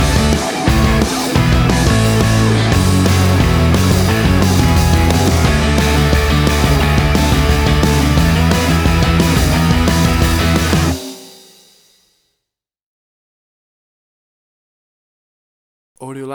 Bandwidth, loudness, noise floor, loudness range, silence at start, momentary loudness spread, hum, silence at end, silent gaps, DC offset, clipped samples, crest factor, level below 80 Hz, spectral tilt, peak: over 20 kHz; -13 LUFS; -80 dBFS; 5 LU; 0 s; 2 LU; none; 0 s; 12.83-15.95 s; under 0.1%; under 0.1%; 12 dB; -20 dBFS; -5.5 dB/octave; -2 dBFS